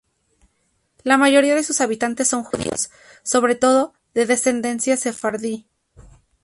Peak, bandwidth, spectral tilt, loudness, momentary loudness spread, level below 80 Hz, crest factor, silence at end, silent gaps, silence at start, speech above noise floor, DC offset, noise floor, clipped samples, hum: -2 dBFS; 11.5 kHz; -2.5 dB/octave; -19 LUFS; 12 LU; -56 dBFS; 18 dB; 0.4 s; none; 1.05 s; 49 dB; under 0.1%; -67 dBFS; under 0.1%; none